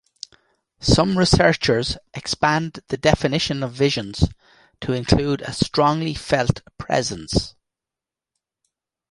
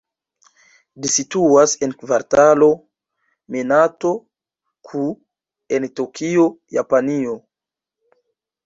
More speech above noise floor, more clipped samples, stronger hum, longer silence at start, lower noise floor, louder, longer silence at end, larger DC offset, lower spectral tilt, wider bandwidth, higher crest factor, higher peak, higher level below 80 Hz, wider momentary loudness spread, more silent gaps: about the same, 68 dB vs 71 dB; neither; neither; second, 0.8 s vs 1 s; about the same, -88 dBFS vs -88 dBFS; about the same, -20 LUFS vs -18 LUFS; first, 1.6 s vs 1.25 s; neither; about the same, -5 dB/octave vs -4 dB/octave; first, 11.5 kHz vs 8 kHz; about the same, 20 dB vs 18 dB; about the same, -2 dBFS vs -2 dBFS; first, -36 dBFS vs -60 dBFS; about the same, 12 LU vs 13 LU; neither